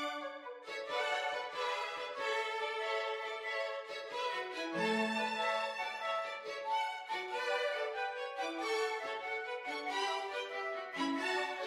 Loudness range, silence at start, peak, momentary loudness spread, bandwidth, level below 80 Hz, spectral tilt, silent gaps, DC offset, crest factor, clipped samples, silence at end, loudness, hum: 1 LU; 0 s; -22 dBFS; 6 LU; 15.5 kHz; -84 dBFS; -2.5 dB/octave; none; under 0.1%; 16 dB; under 0.1%; 0 s; -37 LUFS; none